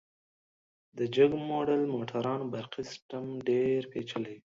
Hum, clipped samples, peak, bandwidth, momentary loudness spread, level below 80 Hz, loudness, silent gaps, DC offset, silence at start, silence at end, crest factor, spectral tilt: none; under 0.1%; -12 dBFS; 7.6 kHz; 14 LU; -70 dBFS; -31 LUFS; 3.02-3.09 s; under 0.1%; 0.95 s; 0.2 s; 20 dB; -6.5 dB/octave